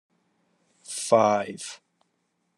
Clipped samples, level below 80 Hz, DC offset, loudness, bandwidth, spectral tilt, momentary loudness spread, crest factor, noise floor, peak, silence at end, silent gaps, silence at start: under 0.1%; -82 dBFS; under 0.1%; -23 LUFS; 12.5 kHz; -4 dB/octave; 17 LU; 22 dB; -74 dBFS; -6 dBFS; 0.8 s; none; 0.9 s